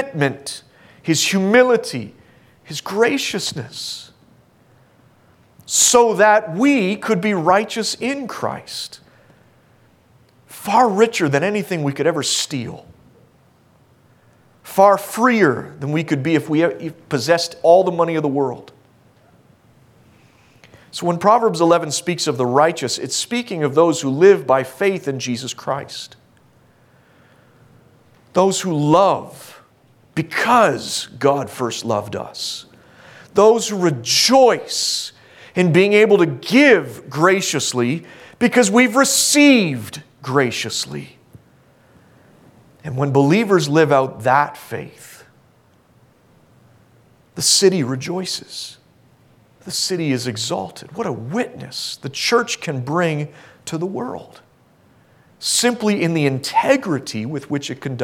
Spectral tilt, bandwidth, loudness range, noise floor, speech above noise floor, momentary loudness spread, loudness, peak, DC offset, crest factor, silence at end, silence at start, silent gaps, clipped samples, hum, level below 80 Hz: -4 dB/octave; 17.5 kHz; 9 LU; -54 dBFS; 37 dB; 16 LU; -17 LUFS; 0 dBFS; under 0.1%; 18 dB; 0 s; 0 s; none; under 0.1%; none; -62 dBFS